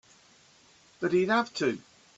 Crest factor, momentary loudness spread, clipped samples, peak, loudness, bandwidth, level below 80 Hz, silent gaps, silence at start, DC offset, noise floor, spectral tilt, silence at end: 16 dB; 9 LU; under 0.1%; -14 dBFS; -28 LUFS; 8 kHz; -72 dBFS; none; 1 s; under 0.1%; -60 dBFS; -5 dB/octave; 0.4 s